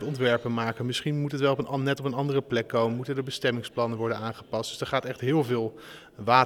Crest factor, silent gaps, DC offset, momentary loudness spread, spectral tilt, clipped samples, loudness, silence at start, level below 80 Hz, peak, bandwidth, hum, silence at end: 22 dB; none; under 0.1%; 7 LU; -6 dB/octave; under 0.1%; -28 LUFS; 0 s; -66 dBFS; -6 dBFS; 17.5 kHz; none; 0 s